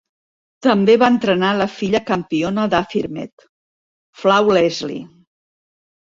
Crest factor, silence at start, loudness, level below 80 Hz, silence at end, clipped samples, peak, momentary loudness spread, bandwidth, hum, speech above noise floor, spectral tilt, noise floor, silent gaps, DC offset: 18 dB; 0.65 s; -17 LUFS; -54 dBFS; 1.05 s; under 0.1%; -2 dBFS; 14 LU; 7.6 kHz; none; over 74 dB; -6 dB/octave; under -90 dBFS; 3.32-3.37 s, 3.49-4.13 s; under 0.1%